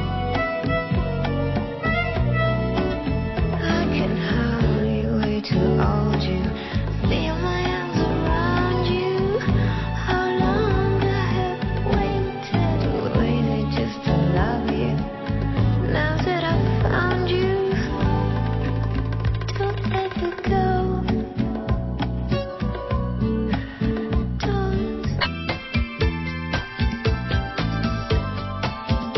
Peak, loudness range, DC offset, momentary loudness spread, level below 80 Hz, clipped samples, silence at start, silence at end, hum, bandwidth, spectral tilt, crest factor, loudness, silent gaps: -6 dBFS; 3 LU; under 0.1%; 5 LU; -30 dBFS; under 0.1%; 0 s; 0 s; none; 6 kHz; -8 dB/octave; 16 dB; -23 LUFS; none